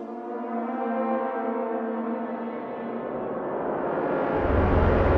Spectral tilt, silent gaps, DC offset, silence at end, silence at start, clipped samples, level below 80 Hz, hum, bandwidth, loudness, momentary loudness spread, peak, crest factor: -10 dB/octave; none; under 0.1%; 0 s; 0 s; under 0.1%; -34 dBFS; none; 5.4 kHz; -27 LUFS; 11 LU; -8 dBFS; 18 dB